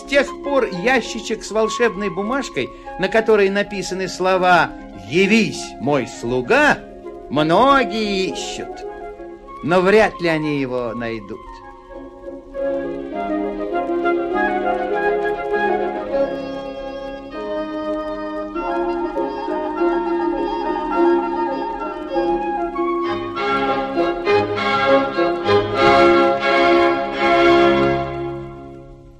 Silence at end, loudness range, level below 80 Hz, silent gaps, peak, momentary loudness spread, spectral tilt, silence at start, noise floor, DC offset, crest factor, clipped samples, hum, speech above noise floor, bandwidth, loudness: 0 s; 9 LU; -44 dBFS; none; -4 dBFS; 15 LU; -5 dB/octave; 0 s; -39 dBFS; under 0.1%; 16 dB; under 0.1%; none; 21 dB; 12 kHz; -18 LUFS